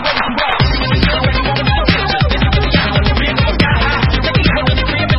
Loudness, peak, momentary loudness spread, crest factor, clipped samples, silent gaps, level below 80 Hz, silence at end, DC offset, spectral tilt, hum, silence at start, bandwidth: -13 LUFS; 0 dBFS; 2 LU; 12 dB; under 0.1%; none; -18 dBFS; 0 s; under 0.1%; -7.5 dB/octave; none; 0 s; 5.8 kHz